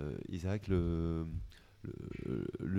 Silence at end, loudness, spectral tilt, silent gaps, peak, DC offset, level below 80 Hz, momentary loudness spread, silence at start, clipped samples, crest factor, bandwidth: 0 s; -39 LUFS; -8.5 dB/octave; none; -20 dBFS; under 0.1%; -48 dBFS; 14 LU; 0 s; under 0.1%; 18 dB; 11 kHz